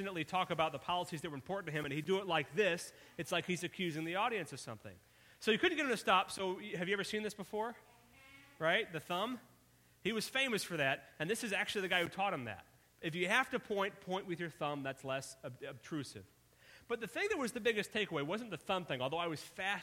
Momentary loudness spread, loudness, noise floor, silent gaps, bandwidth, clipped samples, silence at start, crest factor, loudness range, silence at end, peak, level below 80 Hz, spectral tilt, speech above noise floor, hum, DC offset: 11 LU; -37 LUFS; -68 dBFS; none; 16.5 kHz; under 0.1%; 0 s; 22 dB; 4 LU; 0 s; -16 dBFS; -74 dBFS; -4 dB/octave; 30 dB; none; under 0.1%